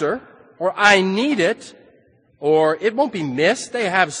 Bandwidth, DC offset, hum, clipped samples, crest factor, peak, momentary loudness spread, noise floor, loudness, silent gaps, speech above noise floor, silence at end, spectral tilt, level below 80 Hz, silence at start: 10 kHz; under 0.1%; none; under 0.1%; 20 dB; 0 dBFS; 11 LU; -56 dBFS; -18 LUFS; none; 37 dB; 0 s; -4 dB/octave; -64 dBFS; 0 s